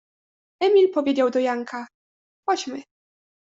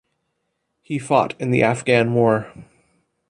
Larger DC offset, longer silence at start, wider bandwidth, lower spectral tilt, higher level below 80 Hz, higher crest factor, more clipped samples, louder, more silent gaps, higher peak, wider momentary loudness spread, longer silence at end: neither; second, 0.6 s vs 0.9 s; second, 7.8 kHz vs 11 kHz; second, -3.5 dB/octave vs -6.5 dB/octave; second, -74 dBFS vs -58 dBFS; about the same, 16 dB vs 18 dB; neither; second, -22 LUFS vs -19 LUFS; first, 1.94-2.43 s vs none; second, -8 dBFS vs -2 dBFS; first, 17 LU vs 12 LU; about the same, 0.75 s vs 0.65 s